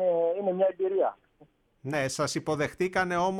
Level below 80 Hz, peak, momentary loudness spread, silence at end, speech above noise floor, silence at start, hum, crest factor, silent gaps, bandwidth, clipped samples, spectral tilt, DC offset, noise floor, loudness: -62 dBFS; -12 dBFS; 5 LU; 0 s; 34 dB; 0 s; none; 16 dB; none; 14.5 kHz; under 0.1%; -5 dB/octave; under 0.1%; -61 dBFS; -28 LUFS